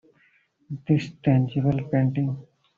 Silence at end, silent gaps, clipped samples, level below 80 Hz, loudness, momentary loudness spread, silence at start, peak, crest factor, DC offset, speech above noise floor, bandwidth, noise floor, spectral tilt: 0.35 s; none; under 0.1%; -56 dBFS; -24 LUFS; 15 LU; 0.7 s; -8 dBFS; 16 dB; under 0.1%; 40 dB; 7.2 kHz; -63 dBFS; -8.5 dB/octave